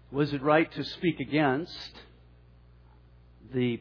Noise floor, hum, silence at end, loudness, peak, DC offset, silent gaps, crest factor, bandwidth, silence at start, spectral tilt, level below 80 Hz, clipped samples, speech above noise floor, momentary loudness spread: -56 dBFS; 60 Hz at -55 dBFS; 0 s; -28 LUFS; -10 dBFS; under 0.1%; none; 20 dB; 5.4 kHz; 0.1 s; -7.5 dB/octave; -58 dBFS; under 0.1%; 28 dB; 14 LU